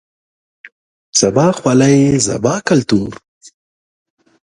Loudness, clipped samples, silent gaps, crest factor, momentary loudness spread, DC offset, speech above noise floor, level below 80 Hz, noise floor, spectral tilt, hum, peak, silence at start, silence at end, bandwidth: -13 LUFS; under 0.1%; 0.72-1.13 s, 3.28-3.41 s; 16 dB; 7 LU; under 0.1%; over 78 dB; -48 dBFS; under -90 dBFS; -5 dB/octave; none; 0 dBFS; 0.65 s; 1 s; 11.5 kHz